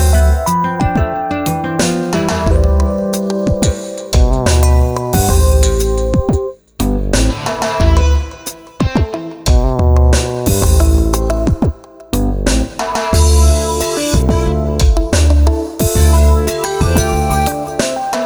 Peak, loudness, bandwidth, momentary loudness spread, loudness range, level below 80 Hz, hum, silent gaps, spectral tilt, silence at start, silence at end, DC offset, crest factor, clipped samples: 0 dBFS; -14 LUFS; over 20 kHz; 7 LU; 2 LU; -14 dBFS; none; none; -5.5 dB/octave; 0 s; 0 s; under 0.1%; 12 dB; under 0.1%